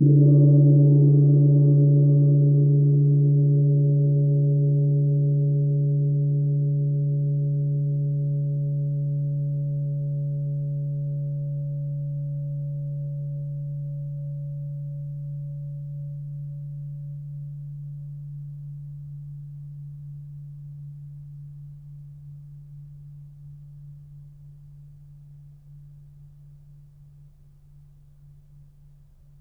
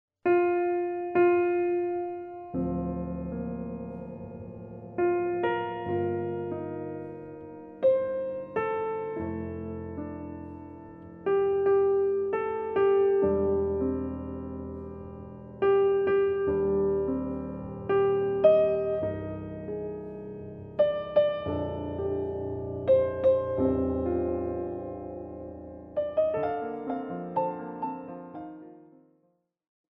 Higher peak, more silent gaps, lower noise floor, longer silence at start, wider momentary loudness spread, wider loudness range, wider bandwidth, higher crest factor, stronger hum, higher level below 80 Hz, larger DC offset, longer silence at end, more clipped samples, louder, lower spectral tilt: about the same, -8 dBFS vs -8 dBFS; neither; second, -51 dBFS vs -72 dBFS; second, 0 s vs 0.25 s; first, 24 LU vs 17 LU; first, 24 LU vs 6 LU; second, 0.8 kHz vs 4 kHz; second, 14 dB vs 20 dB; neither; about the same, -54 dBFS vs -52 dBFS; neither; first, 3.15 s vs 1.1 s; neither; first, -22 LUFS vs -28 LUFS; first, -15 dB/octave vs -10.5 dB/octave